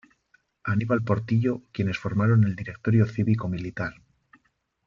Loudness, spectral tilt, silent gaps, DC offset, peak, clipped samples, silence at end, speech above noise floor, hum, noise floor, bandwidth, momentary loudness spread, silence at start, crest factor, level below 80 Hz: -25 LUFS; -9 dB/octave; none; under 0.1%; -8 dBFS; under 0.1%; 0.95 s; 46 dB; none; -70 dBFS; 7 kHz; 10 LU; 0.65 s; 18 dB; -56 dBFS